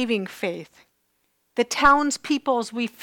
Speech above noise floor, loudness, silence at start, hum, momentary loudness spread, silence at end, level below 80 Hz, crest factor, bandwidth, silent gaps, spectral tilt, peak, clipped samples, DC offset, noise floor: 48 dB; -22 LUFS; 0 s; none; 13 LU; 0 s; -50 dBFS; 18 dB; 18 kHz; none; -3 dB/octave; -6 dBFS; under 0.1%; under 0.1%; -70 dBFS